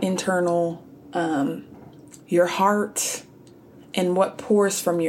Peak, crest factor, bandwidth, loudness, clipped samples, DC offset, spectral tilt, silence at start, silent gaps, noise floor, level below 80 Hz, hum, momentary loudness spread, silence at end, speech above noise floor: -6 dBFS; 18 dB; 17 kHz; -23 LUFS; under 0.1%; under 0.1%; -4.5 dB/octave; 0 s; none; -48 dBFS; -68 dBFS; none; 11 LU; 0 s; 26 dB